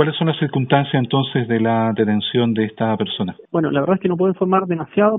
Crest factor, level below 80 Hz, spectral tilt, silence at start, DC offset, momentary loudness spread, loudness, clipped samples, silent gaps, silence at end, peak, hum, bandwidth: 16 dB; -60 dBFS; -5.5 dB/octave; 0 s; under 0.1%; 4 LU; -19 LUFS; under 0.1%; none; 0 s; 0 dBFS; none; 4 kHz